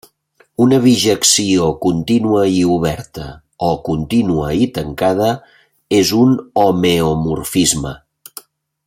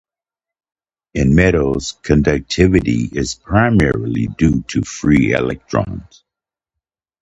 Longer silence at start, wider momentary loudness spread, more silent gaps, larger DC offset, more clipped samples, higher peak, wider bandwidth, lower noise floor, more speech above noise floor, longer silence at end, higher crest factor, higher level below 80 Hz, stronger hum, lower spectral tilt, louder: second, 0.6 s vs 1.15 s; first, 17 LU vs 9 LU; neither; neither; neither; about the same, 0 dBFS vs 0 dBFS; first, 16.5 kHz vs 9 kHz; second, -55 dBFS vs -88 dBFS; second, 41 dB vs 73 dB; second, 0.9 s vs 1.2 s; about the same, 16 dB vs 16 dB; second, -42 dBFS vs -30 dBFS; neither; second, -4.5 dB/octave vs -6.5 dB/octave; about the same, -14 LUFS vs -16 LUFS